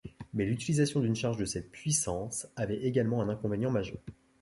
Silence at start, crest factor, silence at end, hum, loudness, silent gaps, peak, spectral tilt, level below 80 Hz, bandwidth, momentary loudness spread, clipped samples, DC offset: 0.05 s; 18 dB; 0.3 s; none; -32 LUFS; none; -14 dBFS; -5.5 dB/octave; -56 dBFS; 11.5 kHz; 9 LU; under 0.1%; under 0.1%